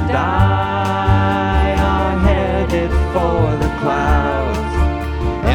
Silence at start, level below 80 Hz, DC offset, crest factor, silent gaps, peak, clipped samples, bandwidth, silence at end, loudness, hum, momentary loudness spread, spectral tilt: 0 s; -20 dBFS; under 0.1%; 14 dB; none; -2 dBFS; under 0.1%; 11 kHz; 0 s; -16 LUFS; none; 4 LU; -7.5 dB/octave